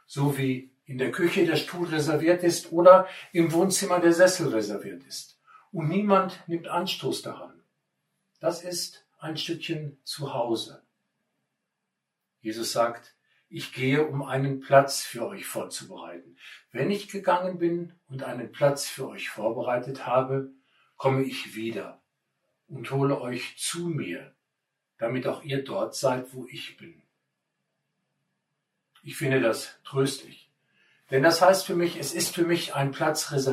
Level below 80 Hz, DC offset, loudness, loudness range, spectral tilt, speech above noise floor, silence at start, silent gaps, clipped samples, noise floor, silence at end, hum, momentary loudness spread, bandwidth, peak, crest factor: -74 dBFS; under 0.1%; -26 LUFS; 12 LU; -4.5 dB/octave; 57 dB; 0.1 s; none; under 0.1%; -83 dBFS; 0 s; none; 18 LU; 16 kHz; -2 dBFS; 24 dB